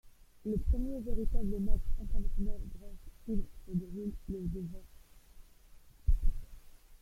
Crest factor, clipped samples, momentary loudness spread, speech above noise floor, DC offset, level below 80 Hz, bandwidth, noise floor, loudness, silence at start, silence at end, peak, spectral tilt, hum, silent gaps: 18 dB; under 0.1%; 14 LU; 26 dB; under 0.1%; -36 dBFS; 1.1 kHz; -56 dBFS; -39 LUFS; 0.05 s; 0.05 s; -14 dBFS; -9 dB/octave; none; none